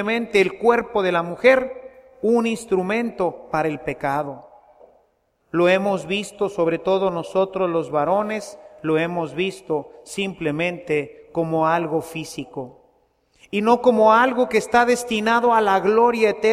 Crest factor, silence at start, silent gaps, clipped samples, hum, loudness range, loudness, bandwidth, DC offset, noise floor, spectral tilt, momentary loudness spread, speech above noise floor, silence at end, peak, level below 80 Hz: 20 dB; 0 s; none; under 0.1%; none; 6 LU; -20 LUFS; 14.5 kHz; under 0.1%; -65 dBFS; -5 dB/octave; 13 LU; 45 dB; 0 s; 0 dBFS; -56 dBFS